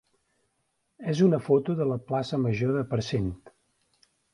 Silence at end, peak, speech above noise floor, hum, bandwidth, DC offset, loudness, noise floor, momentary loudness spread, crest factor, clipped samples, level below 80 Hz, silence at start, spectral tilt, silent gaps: 0.95 s; -10 dBFS; 50 dB; none; 11 kHz; under 0.1%; -27 LUFS; -75 dBFS; 10 LU; 18 dB; under 0.1%; -54 dBFS; 1 s; -7.5 dB/octave; none